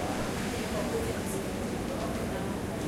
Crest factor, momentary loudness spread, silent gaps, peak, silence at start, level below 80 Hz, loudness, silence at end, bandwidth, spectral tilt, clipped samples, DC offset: 12 dB; 2 LU; none; -20 dBFS; 0 s; -46 dBFS; -33 LUFS; 0 s; 16.5 kHz; -5 dB/octave; under 0.1%; under 0.1%